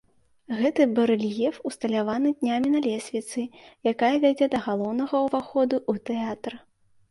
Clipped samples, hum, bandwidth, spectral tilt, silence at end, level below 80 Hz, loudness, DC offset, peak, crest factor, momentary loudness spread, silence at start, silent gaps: under 0.1%; none; 11.5 kHz; -5.5 dB/octave; 0.5 s; -66 dBFS; -25 LUFS; under 0.1%; -8 dBFS; 16 dB; 10 LU; 0.5 s; none